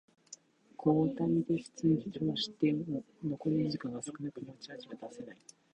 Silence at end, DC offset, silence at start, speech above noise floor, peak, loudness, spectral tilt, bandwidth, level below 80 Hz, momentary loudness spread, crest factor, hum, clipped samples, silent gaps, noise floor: 0.4 s; under 0.1%; 0.3 s; 23 dB; -16 dBFS; -34 LUFS; -6.5 dB/octave; 10 kHz; -68 dBFS; 18 LU; 18 dB; none; under 0.1%; none; -57 dBFS